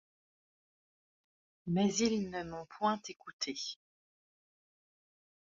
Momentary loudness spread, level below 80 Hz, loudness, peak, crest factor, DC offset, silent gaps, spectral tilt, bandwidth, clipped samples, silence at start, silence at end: 16 LU; -70 dBFS; -35 LUFS; -18 dBFS; 20 dB; under 0.1%; 3.33-3.39 s; -4.5 dB/octave; 7.6 kHz; under 0.1%; 1.65 s; 1.7 s